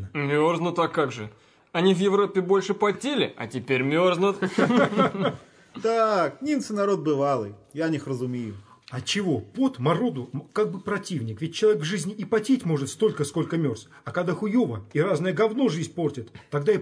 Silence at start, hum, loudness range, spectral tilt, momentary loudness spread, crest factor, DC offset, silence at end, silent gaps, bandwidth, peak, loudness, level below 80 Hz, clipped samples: 0 s; none; 4 LU; -6 dB/octave; 10 LU; 18 dB; under 0.1%; 0 s; none; 11 kHz; -6 dBFS; -25 LUFS; -68 dBFS; under 0.1%